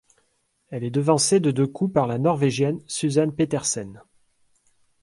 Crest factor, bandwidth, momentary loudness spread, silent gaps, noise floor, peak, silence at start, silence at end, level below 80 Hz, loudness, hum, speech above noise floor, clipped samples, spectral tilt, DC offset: 18 dB; 11.5 kHz; 10 LU; none; -69 dBFS; -4 dBFS; 0.7 s; 1.05 s; -60 dBFS; -22 LUFS; none; 47 dB; under 0.1%; -5 dB/octave; under 0.1%